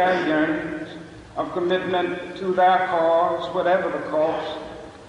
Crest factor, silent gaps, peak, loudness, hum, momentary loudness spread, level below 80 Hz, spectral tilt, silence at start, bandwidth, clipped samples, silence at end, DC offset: 14 dB; none; -8 dBFS; -22 LUFS; none; 15 LU; -56 dBFS; -6 dB/octave; 0 s; 10.5 kHz; under 0.1%; 0 s; under 0.1%